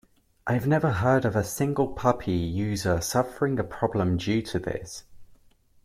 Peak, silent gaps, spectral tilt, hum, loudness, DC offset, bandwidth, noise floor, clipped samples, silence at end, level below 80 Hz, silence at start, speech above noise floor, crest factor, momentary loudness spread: -6 dBFS; none; -6 dB/octave; none; -26 LUFS; under 0.1%; 16 kHz; -59 dBFS; under 0.1%; 0.6 s; -50 dBFS; 0.45 s; 33 dB; 20 dB; 8 LU